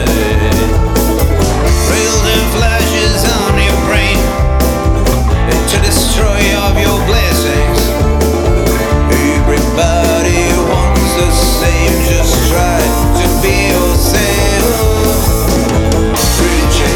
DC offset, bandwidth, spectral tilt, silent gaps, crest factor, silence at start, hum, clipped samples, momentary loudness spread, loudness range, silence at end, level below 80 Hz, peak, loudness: under 0.1%; 19 kHz; -4.5 dB/octave; none; 10 dB; 0 s; none; under 0.1%; 2 LU; 1 LU; 0 s; -14 dBFS; 0 dBFS; -11 LUFS